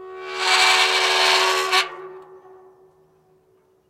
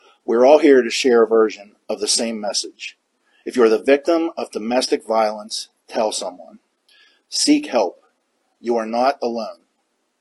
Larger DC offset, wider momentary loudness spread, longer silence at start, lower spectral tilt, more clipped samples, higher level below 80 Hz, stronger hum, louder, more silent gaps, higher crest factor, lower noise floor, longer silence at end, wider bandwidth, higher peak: neither; about the same, 14 LU vs 16 LU; second, 0 s vs 0.3 s; second, 1 dB/octave vs -2.5 dB/octave; neither; about the same, -68 dBFS vs -70 dBFS; neither; about the same, -17 LUFS vs -18 LUFS; neither; about the same, 18 dB vs 20 dB; second, -60 dBFS vs -69 dBFS; first, 1.5 s vs 0.65 s; first, 16 kHz vs 12 kHz; second, -4 dBFS vs 0 dBFS